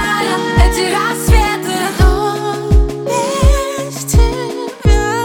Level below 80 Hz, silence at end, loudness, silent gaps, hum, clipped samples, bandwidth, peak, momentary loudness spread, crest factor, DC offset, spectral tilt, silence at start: -16 dBFS; 0 s; -14 LUFS; none; none; under 0.1%; 17.5 kHz; 0 dBFS; 5 LU; 12 dB; under 0.1%; -5 dB/octave; 0 s